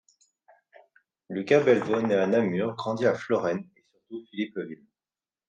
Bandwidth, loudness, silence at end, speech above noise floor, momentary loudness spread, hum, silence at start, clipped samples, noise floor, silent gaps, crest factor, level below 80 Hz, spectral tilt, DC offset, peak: 8.8 kHz; -26 LUFS; 0.75 s; over 65 dB; 18 LU; none; 1.3 s; under 0.1%; under -90 dBFS; none; 20 dB; -74 dBFS; -6.5 dB/octave; under 0.1%; -8 dBFS